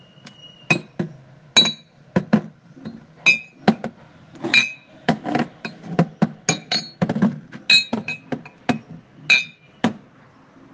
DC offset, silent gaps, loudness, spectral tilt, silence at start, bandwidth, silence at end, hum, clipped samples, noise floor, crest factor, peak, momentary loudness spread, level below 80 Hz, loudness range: under 0.1%; none; -20 LUFS; -3.5 dB/octave; 0.25 s; 10 kHz; 0.75 s; none; under 0.1%; -50 dBFS; 22 dB; 0 dBFS; 18 LU; -62 dBFS; 2 LU